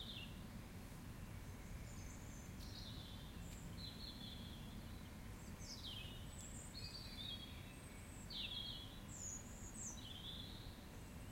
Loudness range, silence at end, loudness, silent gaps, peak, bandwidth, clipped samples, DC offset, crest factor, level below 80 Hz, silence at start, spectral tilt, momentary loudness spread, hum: 4 LU; 0 s; -52 LUFS; none; -36 dBFS; 16.5 kHz; under 0.1%; under 0.1%; 16 dB; -58 dBFS; 0 s; -3.5 dB/octave; 6 LU; none